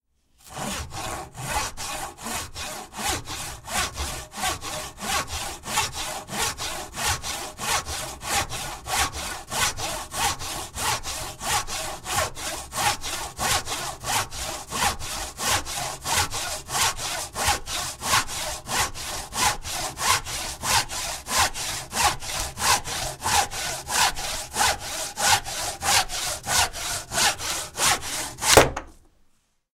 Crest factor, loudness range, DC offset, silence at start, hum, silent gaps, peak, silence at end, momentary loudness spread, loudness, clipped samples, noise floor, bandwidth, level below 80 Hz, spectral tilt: 26 dB; 6 LU; under 0.1%; 0.45 s; none; none; -2 dBFS; 0.8 s; 10 LU; -25 LUFS; under 0.1%; -63 dBFS; 16 kHz; -42 dBFS; -1 dB/octave